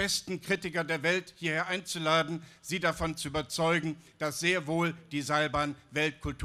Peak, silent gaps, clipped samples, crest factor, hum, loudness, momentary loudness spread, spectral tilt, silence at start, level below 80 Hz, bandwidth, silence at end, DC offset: -12 dBFS; none; under 0.1%; 18 dB; none; -31 LUFS; 7 LU; -4 dB/octave; 0 s; -54 dBFS; 15 kHz; 0 s; under 0.1%